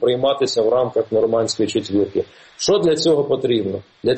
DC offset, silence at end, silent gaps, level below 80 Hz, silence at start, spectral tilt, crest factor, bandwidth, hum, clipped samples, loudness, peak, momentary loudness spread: under 0.1%; 0 s; none; -56 dBFS; 0 s; -5 dB/octave; 14 dB; 8.8 kHz; none; under 0.1%; -19 LUFS; -6 dBFS; 7 LU